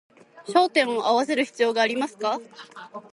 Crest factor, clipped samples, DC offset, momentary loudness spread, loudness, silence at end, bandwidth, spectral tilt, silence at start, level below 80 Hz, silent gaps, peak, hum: 18 dB; under 0.1%; under 0.1%; 21 LU; -23 LUFS; 0.1 s; 11.5 kHz; -3 dB/octave; 0.35 s; -78 dBFS; none; -6 dBFS; none